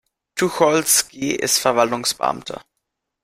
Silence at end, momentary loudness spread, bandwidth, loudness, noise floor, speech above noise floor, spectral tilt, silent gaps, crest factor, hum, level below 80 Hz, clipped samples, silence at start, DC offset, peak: 0.6 s; 15 LU; 16 kHz; -18 LUFS; -78 dBFS; 58 dB; -2 dB/octave; none; 20 dB; none; -58 dBFS; under 0.1%; 0.35 s; under 0.1%; -2 dBFS